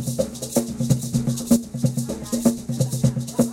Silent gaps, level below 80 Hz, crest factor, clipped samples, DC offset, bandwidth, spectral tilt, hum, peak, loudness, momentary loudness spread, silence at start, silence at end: none; -46 dBFS; 18 dB; under 0.1%; under 0.1%; 16.5 kHz; -6 dB/octave; none; -4 dBFS; -23 LUFS; 5 LU; 0 s; 0 s